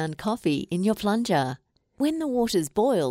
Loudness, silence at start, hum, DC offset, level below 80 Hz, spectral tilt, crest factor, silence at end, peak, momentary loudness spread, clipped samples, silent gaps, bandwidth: -25 LUFS; 0 s; none; under 0.1%; -58 dBFS; -5.5 dB/octave; 16 dB; 0 s; -10 dBFS; 5 LU; under 0.1%; none; 16 kHz